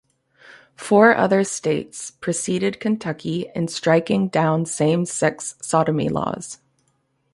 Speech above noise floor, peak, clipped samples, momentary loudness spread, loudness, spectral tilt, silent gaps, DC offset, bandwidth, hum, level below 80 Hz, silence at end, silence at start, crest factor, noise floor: 47 dB; -2 dBFS; under 0.1%; 14 LU; -20 LUFS; -5 dB/octave; none; under 0.1%; 11.5 kHz; none; -58 dBFS; 0.8 s; 0.5 s; 18 dB; -67 dBFS